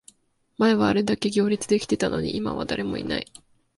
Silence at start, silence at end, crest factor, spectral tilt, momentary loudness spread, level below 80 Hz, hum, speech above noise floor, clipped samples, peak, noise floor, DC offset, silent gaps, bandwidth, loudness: 0.6 s; 0.55 s; 18 dB; -5 dB/octave; 8 LU; -52 dBFS; none; 33 dB; under 0.1%; -6 dBFS; -56 dBFS; under 0.1%; none; 11.5 kHz; -24 LUFS